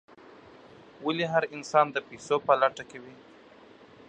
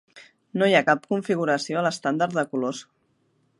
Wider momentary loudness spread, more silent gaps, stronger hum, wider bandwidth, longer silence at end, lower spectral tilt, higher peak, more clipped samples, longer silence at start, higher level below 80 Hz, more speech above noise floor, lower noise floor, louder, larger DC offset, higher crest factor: first, 17 LU vs 10 LU; neither; neither; second, 9.4 kHz vs 11.5 kHz; first, 0.95 s vs 0.75 s; about the same, -4.5 dB/octave vs -5 dB/octave; second, -8 dBFS vs -4 dBFS; neither; first, 1 s vs 0.15 s; about the same, -72 dBFS vs -76 dBFS; second, 26 dB vs 44 dB; second, -53 dBFS vs -68 dBFS; second, -27 LUFS vs -23 LUFS; neither; about the same, 22 dB vs 20 dB